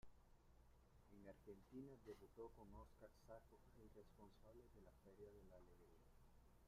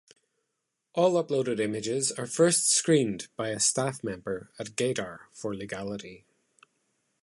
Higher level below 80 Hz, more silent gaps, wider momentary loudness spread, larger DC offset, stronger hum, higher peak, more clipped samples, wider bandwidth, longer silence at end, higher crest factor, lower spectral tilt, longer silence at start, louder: about the same, -72 dBFS vs -68 dBFS; neither; second, 8 LU vs 14 LU; neither; neither; second, -48 dBFS vs -10 dBFS; neither; first, 15 kHz vs 12 kHz; second, 0 s vs 1.05 s; about the same, 18 dB vs 20 dB; first, -7 dB/octave vs -3.5 dB/octave; second, 0 s vs 0.95 s; second, -65 LUFS vs -27 LUFS